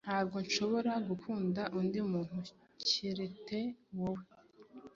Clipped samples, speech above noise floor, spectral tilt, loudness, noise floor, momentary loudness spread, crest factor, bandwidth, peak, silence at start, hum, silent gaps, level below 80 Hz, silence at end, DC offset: under 0.1%; 20 dB; -4 dB/octave; -37 LUFS; -57 dBFS; 9 LU; 20 dB; 7.6 kHz; -18 dBFS; 0.05 s; none; none; -72 dBFS; 0.05 s; under 0.1%